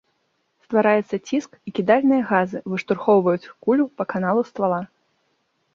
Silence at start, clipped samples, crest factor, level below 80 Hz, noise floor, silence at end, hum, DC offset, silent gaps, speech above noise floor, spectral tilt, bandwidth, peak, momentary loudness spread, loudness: 0.7 s; under 0.1%; 18 dB; -66 dBFS; -70 dBFS; 0.9 s; none; under 0.1%; none; 50 dB; -7 dB/octave; 7.2 kHz; -2 dBFS; 9 LU; -21 LUFS